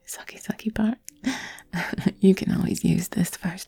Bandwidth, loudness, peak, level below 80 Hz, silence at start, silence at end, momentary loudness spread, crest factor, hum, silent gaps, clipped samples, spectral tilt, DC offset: 18 kHz; -25 LUFS; -6 dBFS; -50 dBFS; 0.1 s; 0.05 s; 13 LU; 20 dB; none; none; under 0.1%; -6 dB/octave; under 0.1%